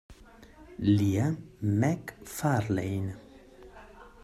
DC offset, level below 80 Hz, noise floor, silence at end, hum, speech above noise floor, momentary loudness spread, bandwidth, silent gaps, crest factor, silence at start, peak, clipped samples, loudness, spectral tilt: under 0.1%; -58 dBFS; -53 dBFS; 0.15 s; none; 25 dB; 23 LU; 14.5 kHz; none; 18 dB; 0.1 s; -14 dBFS; under 0.1%; -29 LUFS; -7 dB/octave